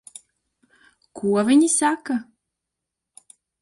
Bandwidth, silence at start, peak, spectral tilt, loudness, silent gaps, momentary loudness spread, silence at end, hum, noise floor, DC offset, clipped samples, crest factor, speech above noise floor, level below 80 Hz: 11.5 kHz; 1.15 s; -8 dBFS; -4 dB/octave; -20 LUFS; none; 12 LU; 1.4 s; none; -84 dBFS; under 0.1%; under 0.1%; 16 dB; 64 dB; -68 dBFS